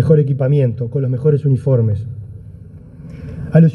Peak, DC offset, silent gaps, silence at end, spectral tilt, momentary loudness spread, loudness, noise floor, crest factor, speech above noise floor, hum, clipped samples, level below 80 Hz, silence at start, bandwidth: 0 dBFS; under 0.1%; none; 0 s; -11.5 dB/octave; 22 LU; -16 LUFS; -36 dBFS; 16 dB; 22 dB; none; under 0.1%; -42 dBFS; 0 s; 3.6 kHz